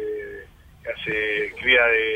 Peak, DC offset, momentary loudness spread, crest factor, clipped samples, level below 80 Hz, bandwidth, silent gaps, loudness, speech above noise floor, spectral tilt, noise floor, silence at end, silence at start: -4 dBFS; under 0.1%; 22 LU; 20 dB; under 0.1%; -50 dBFS; 15 kHz; none; -20 LUFS; 24 dB; -4.5 dB/octave; -44 dBFS; 0 s; 0 s